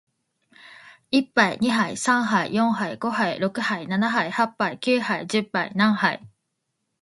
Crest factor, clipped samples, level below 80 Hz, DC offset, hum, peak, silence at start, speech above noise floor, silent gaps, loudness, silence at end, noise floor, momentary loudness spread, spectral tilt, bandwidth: 22 dB; under 0.1%; -68 dBFS; under 0.1%; none; -2 dBFS; 0.65 s; 55 dB; none; -23 LUFS; 0.75 s; -77 dBFS; 5 LU; -4.5 dB/octave; 11.5 kHz